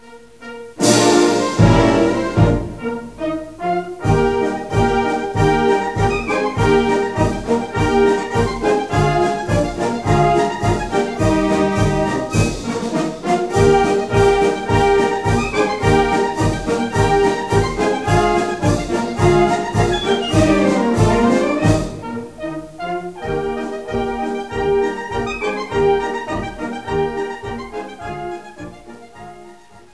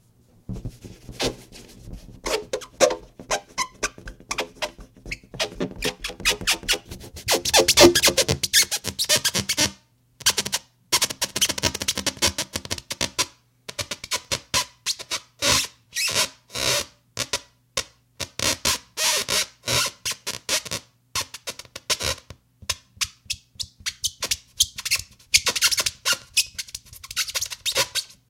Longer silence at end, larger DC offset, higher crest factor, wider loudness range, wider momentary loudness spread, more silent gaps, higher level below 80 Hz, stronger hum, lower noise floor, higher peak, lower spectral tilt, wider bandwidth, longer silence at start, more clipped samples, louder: first, 0.4 s vs 0.25 s; first, 0.4% vs under 0.1%; second, 16 dB vs 24 dB; second, 6 LU vs 10 LU; second, 13 LU vs 16 LU; neither; first, -32 dBFS vs -46 dBFS; neither; second, -42 dBFS vs -53 dBFS; about the same, -2 dBFS vs -2 dBFS; first, -6 dB/octave vs -1.5 dB/octave; second, 11 kHz vs 17 kHz; second, 0.05 s vs 0.5 s; neither; first, -17 LUFS vs -23 LUFS